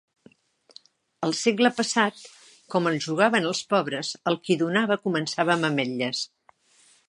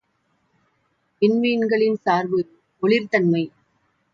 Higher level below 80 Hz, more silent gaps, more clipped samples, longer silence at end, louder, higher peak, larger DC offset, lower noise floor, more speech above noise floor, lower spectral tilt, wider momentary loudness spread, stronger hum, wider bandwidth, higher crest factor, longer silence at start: second, -76 dBFS vs -70 dBFS; neither; neither; first, 0.8 s vs 0.65 s; second, -24 LUFS vs -21 LUFS; about the same, -4 dBFS vs -6 dBFS; neither; second, -60 dBFS vs -68 dBFS; second, 36 dB vs 49 dB; second, -4 dB/octave vs -7.5 dB/octave; about the same, 8 LU vs 7 LU; neither; first, 11.5 kHz vs 7.2 kHz; first, 22 dB vs 16 dB; about the same, 1.2 s vs 1.2 s